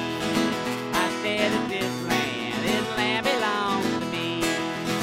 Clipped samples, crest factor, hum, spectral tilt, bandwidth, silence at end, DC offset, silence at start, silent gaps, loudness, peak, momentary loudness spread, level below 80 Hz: under 0.1%; 18 dB; none; -4 dB/octave; 16.5 kHz; 0 s; under 0.1%; 0 s; none; -25 LUFS; -8 dBFS; 4 LU; -54 dBFS